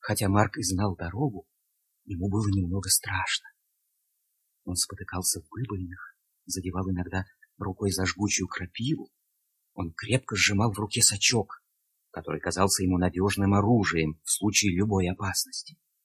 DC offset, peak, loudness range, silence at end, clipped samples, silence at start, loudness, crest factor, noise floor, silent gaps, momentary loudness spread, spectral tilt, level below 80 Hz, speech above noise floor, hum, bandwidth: under 0.1%; -6 dBFS; 7 LU; 0.35 s; under 0.1%; 0.05 s; -27 LUFS; 22 dB; -76 dBFS; none; 14 LU; -3.5 dB/octave; -46 dBFS; 49 dB; none; 16 kHz